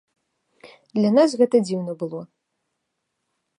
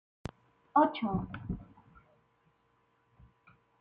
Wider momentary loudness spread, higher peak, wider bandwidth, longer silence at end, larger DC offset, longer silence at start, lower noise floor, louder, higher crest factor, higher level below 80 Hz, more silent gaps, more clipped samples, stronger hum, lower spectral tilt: second, 14 LU vs 20 LU; first, -6 dBFS vs -14 dBFS; first, 11 kHz vs 9.4 kHz; second, 1.35 s vs 2.15 s; neither; first, 0.95 s vs 0.75 s; first, -78 dBFS vs -73 dBFS; first, -21 LUFS vs -32 LUFS; second, 18 dB vs 24 dB; second, -74 dBFS vs -56 dBFS; neither; neither; neither; second, -6.5 dB/octave vs -8 dB/octave